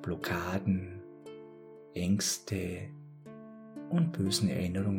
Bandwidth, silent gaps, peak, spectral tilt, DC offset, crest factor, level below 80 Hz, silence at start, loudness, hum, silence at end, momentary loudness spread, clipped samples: 19 kHz; none; -16 dBFS; -5 dB/octave; under 0.1%; 16 dB; -60 dBFS; 0 s; -32 LUFS; none; 0 s; 20 LU; under 0.1%